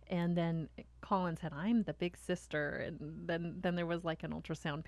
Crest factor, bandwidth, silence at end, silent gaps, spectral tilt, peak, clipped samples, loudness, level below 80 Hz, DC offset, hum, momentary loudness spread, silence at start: 16 dB; 12 kHz; 0 s; none; -7 dB/octave; -22 dBFS; under 0.1%; -38 LUFS; -60 dBFS; under 0.1%; none; 8 LU; 0 s